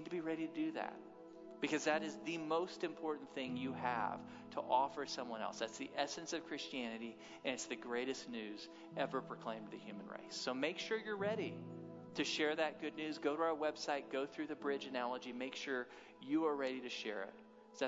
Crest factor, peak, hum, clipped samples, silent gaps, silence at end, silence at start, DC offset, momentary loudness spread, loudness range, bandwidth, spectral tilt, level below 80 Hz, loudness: 22 dB; -22 dBFS; none; under 0.1%; none; 0 s; 0 s; under 0.1%; 13 LU; 4 LU; 7.6 kHz; -2.5 dB/octave; -86 dBFS; -42 LUFS